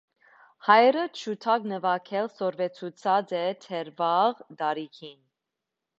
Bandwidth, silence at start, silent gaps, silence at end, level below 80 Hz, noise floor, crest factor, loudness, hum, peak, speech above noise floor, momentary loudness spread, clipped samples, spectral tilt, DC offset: 8 kHz; 0.65 s; none; 0.9 s; -80 dBFS; -86 dBFS; 22 dB; -26 LUFS; none; -4 dBFS; 60 dB; 15 LU; under 0.1%; -5 dB/octave; under 0.1%